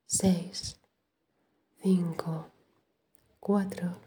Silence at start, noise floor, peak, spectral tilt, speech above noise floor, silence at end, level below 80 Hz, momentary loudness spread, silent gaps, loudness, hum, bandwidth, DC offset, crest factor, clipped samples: 0.1 s; -78 dBFS; -12 dBFS; -5.5 dB/octave; 49 dB; 0.05 s; -62 dBFS; 13 LU; none; -31 LUFS; none; 19.5 kHz; under 0.1%; 20 dB; under 0.1%